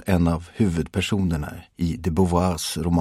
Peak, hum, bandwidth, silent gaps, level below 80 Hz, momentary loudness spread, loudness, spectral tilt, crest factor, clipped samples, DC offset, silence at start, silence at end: -6 dBFS; none; 15 kHz; none; -38 dBFS; 7 LU; -23 LUFS; -6 dB/octave; 16 dB; under 0.1%; under 0.1%; 0 s; 0 s